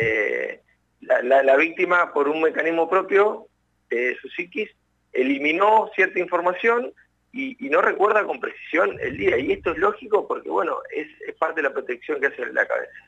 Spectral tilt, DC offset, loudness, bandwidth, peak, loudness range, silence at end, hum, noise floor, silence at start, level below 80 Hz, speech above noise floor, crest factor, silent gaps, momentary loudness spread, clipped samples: -6 dB/octave; under 0.1%; -22 LUFS; 8 kHz; -6 dBFS; 4 LU; 0.1 s; none; -52 dBFS; 0 s; -58 dBFS; 30 dB; 16 dB; none; 12 LU; under 0.1%